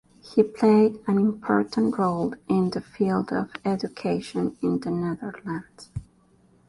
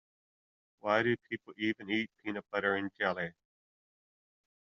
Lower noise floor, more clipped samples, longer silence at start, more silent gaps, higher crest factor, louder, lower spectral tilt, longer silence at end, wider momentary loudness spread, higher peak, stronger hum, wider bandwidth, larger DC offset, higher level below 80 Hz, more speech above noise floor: second, -59 dBFS vs under -90 dBFS; neither; second, 0.25 s vs 0.85 s; neither; second, 18 dB vs 24 dB; first, -25 LUFS vs -34 LUFS; first, -8 dB/octave vs -3 dB/octave; second, 0.65 s vs 1.4 s; first, 14 LU vs 11 LU; first, -6 dBFS vs -12 dBFS; neither; first, 11.5 kHz vs 7 kHz; neither; first, -56 dBFS vs -78 dBFS; second, 35 dB vs over 56 dB